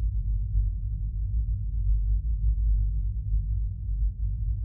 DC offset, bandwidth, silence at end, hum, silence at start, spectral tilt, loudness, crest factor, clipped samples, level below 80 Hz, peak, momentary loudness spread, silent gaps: under 0.1%; 0.5 kHz; 0 s; none; 0 s; -14.5 dB/octave; -30 LUFS; 12 dB; under 0.1%; -26 dBFS; -14 dBFS; 4 LU; none